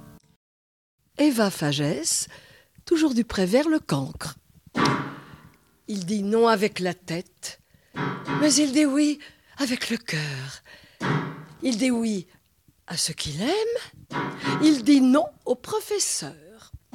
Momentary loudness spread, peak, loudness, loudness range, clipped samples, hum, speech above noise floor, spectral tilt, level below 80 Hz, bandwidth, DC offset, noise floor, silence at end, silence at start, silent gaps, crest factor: 16 LU; -8 dBFS; -24 LUFS; 5 LU; under 0.1%; none; 39 dB; -4 dB/octave; -58 dBFS; 16 kHz; under 0.1%; -63 dBFS; 0.2 s; 0.05 s; 0.36-0.98 s; 18 dB